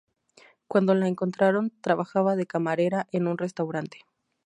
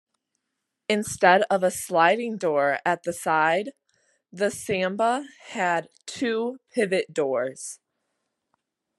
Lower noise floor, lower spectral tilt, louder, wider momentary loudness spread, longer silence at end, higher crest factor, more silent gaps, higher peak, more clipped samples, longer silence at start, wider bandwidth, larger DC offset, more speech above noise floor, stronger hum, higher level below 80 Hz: second, -58 dBFS vs -81 dBFS; first, -7.5 dB/octave vs -4 dB/octave; about the same, -26 LUFS vs -24 LUFS; second, 7 LU vs 13 LU; second, 0.5 s vs 1.25 s; about the same, 20 dB vs 24 dB; neither; second, -8 dBFS vs -2 dBFS; neither; second, 0.7 s vs 0.9 s; second, 10 kHz vs 12.5 kHz; neither; second, 33 dB vs 57 dB; neither; second, -76 dBFS vs -70 dBFS